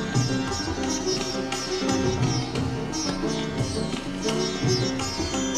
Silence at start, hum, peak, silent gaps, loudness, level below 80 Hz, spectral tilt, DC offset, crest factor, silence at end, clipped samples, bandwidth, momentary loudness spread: 0 s; none; -10 dBFS; none; -26 LUFS; -42 dBFS; -4.5 dB/octave; under 0.1%; 16 dB; 0 s; under 0.1%; 13.5 kHz; 4 LU